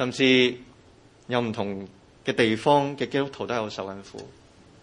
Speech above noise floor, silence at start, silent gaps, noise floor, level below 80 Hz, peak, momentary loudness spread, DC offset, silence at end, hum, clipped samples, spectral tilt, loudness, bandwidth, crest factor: 29 dB; 0 s; none; -54 dBFS; -64 dBFS; -6 dBFS; 21 LU; under 0.1%; 0.5 s; none; under 0.1%; -5 dB/octave; -24 LUFS; 10.5 kHz; 20 dB